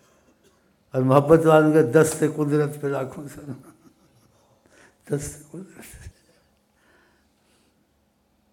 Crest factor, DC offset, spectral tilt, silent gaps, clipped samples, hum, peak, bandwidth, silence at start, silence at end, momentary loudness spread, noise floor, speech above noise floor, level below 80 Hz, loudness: 24 dB; under 0.1%; -7 dB/octave; none; under 0.1%; none; 0 dBFS; 16.5 kHz; 0.95 s; 2.45 s; 25 LU; -66 dBFS; 45 dB; -56 dBFS; -20 LUFS